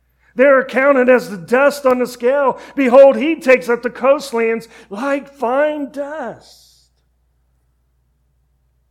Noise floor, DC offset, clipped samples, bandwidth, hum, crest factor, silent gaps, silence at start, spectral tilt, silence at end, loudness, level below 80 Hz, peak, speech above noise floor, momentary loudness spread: -61 dBFS; under 0.1%; 0.1%; 14.5 kHz; none; 16 dB; none; 0.35 s; -5 dB/octave; 2.55 s; -14 LUFS; -58 dBFS; 0 dBFS; 47 dB; 14 LU